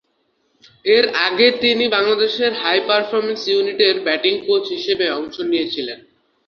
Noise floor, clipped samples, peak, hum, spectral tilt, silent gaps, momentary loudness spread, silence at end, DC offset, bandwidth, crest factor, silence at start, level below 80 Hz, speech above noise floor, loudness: -66 dBFS; under 0.1%; 0 dBFS; none; -4 dB/octave; none; 9 LU; 0.5 s; under 0.1%; 6.8 kHz; 18 dB; 0.85 s; -62 dBFS; 48 dB; -17 LUFS